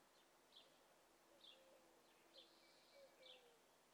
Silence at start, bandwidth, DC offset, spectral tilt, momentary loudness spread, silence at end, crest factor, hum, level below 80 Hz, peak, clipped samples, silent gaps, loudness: 0 s; 19.5 kHz; under 0.1%; -1.5 dB/octave; 4 LU; 0 s; 18 dB; none; under -90 dBFS; -52 dBFS; under 0.1%; none; -67 LUFS